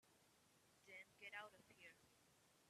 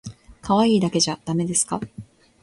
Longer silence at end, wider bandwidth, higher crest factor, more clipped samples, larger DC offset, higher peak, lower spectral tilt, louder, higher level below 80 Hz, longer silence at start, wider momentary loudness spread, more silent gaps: second, 0 s vs 0.4 s; first, 13.5 kHz vs 11.5 kHz; first, 24 dB vs 18 dB; neither; neither; second, -40 dBFS vs -4 dBFS; second, -2 dB/octave vs -4.5 dB/octave; second, -60 LUFS vs -21 LUFS; second, under -90 dBFS vs -54 dBFS; about the same, 0 s vs 0.05 s; second, 9 LU vs 19 LU; neither